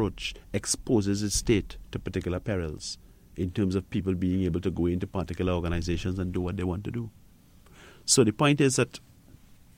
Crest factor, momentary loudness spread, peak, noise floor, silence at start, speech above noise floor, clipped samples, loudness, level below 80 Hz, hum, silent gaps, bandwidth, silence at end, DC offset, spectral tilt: 22 dB; 14 LU; -8 dBFS; -55 dBFS; 0 s; 27 dB; under 0.1%; -28 LUFS; -44 dBFS; none; none; 16.5 kHz; 0.8 s; under 0.1%; -5 dB/octave